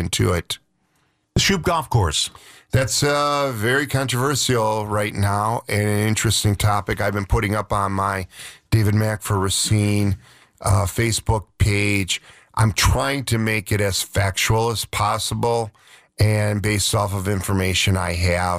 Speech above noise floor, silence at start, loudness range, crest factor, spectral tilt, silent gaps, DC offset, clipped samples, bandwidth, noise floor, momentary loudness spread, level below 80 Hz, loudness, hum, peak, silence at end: 46 dB; 0 s; 1 LU; 14 dB; -4.5 dB/octave; none; under 0.1%; under 0.1%; 16 kHz; -66 dBFS; 6 LU; -36 dBFS; -20 LUFS; none; -6 dBFS; 0 s